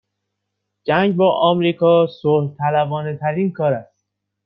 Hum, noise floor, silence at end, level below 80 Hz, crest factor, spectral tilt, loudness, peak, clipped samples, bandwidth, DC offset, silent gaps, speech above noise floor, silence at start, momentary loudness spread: none; -77 dBFS; 0.6 s; -62 dBFS; 16 dB; -10 dB/octave; -18 LUFS; -2 dBFS; under 0.1%; 5.6 kHz; under 0.1%; none; 60 dB; 0.85 s; 8 LU